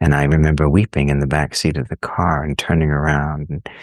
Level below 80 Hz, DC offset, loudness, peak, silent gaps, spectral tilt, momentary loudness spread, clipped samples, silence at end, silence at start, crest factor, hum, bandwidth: -28 dBFS; under 0.1%; -17 LUFS; -2 dBFS; none; -6.5 dB/octave; 9 LU; under 0.1%; 0 s; 0 s; 16 dB; none; 12.5 kHz